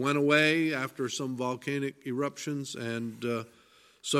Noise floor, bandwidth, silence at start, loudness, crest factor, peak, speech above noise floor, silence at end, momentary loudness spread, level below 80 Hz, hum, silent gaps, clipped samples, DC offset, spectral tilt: -56 dBFS; 15.5 kHz; 0 s; -30 LUFS; 20 dB; -10 dBFS; 26 dB; 0 s; 12 LU; -76 dBFS; none; none; under 0.1%; under 0.1%; -4.5 dB/octave